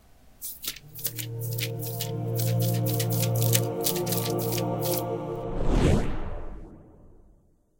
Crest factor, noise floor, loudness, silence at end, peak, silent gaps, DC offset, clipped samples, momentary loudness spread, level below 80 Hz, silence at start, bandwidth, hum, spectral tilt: 26 dB; -60 dBFS; -28 LUFS; 0.6 s; -2 dBFS; none; under 0.1%; under 0.1%; 12 LU; -36 dBFS; 0.25 s; 17.5 kHz; none; -5 dB/octave